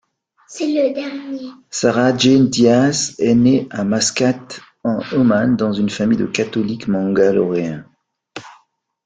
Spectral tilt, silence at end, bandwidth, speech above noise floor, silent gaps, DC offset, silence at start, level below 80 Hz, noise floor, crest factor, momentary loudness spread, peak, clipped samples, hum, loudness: -5 dB/octave; 0.55 s; 9.4 kHz; 41 dB; none; under 0.1%; 0.5 s; -54 dBFS; -57 dBFS; 16 dB; 16 LU; -2 dBFS; under 0.1%; none; -16 LUFS